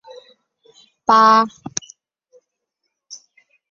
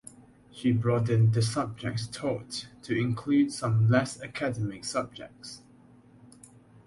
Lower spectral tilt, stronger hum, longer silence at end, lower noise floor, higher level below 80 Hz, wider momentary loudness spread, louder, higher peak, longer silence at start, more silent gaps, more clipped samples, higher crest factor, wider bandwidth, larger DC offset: second, -2.5 dB/octave vs -6.5 dB/octave; neither; second, 0.55 s vs 1.3 s; first, -77 dBFS vs -56 dBFS; second, -68 dBFS vs -60 dBFS; first, 28 LU vs 16 LU; first, -15 LUFS vs -28 LUFS; first, 0 dBFS vs -10 dBFS; first, 1.1 s vs 0.55 s; neither; neither; about the same, 20 dB vs 18 dB; second, 7.6 kHz vs 11.5 kHz; neither